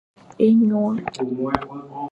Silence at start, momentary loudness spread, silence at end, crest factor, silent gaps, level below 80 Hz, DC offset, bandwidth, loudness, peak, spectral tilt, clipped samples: 0.4 s; 13 LU; 0 s; 20 dB; none; -52 dBFS; under 0.1%; 8.2 kHz; -20 LUFS; 0 dBFS; -8 dB/octave; under 0.1%